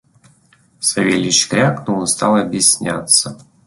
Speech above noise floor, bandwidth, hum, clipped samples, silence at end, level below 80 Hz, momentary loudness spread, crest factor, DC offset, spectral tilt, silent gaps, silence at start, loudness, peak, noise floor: 38 dB; 12 kHz; none; under 0.1%; 0.3 s; -54 dBFS; 6 LU; 18 dB; under 0.1%; -3 dB/octave; none; 0.8 s; -14 LUFS; 0 dBFS; -53 dBFS